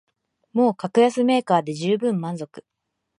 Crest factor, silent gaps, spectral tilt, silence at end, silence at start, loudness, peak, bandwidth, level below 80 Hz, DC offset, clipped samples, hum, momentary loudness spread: 18 dB; none; -6.5 dB/octave; 0.6 s; 0.55 s; -21 LUFS; -4 dBFS; 11 kHz; -74 dBFS; under 0.1%; under 0.1%; none; 12 LU